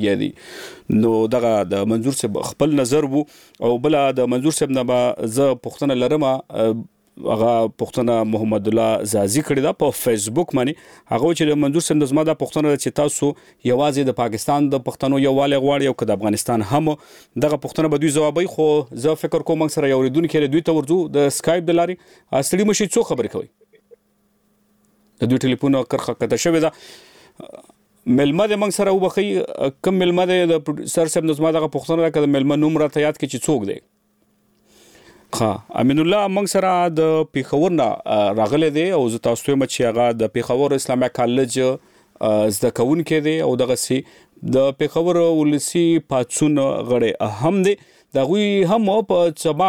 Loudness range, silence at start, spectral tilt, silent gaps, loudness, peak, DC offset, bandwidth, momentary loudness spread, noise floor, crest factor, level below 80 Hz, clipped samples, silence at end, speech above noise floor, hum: 3 LU; 0 s; -5.5 dB/octave; none; -19 LUFS; -2 dBFS; 0.1%; 18.5 kHz; 5 LU; -63 dBFS; 16 dB; -56 dBFS; under 0.1%; 0 s; 45 dB; none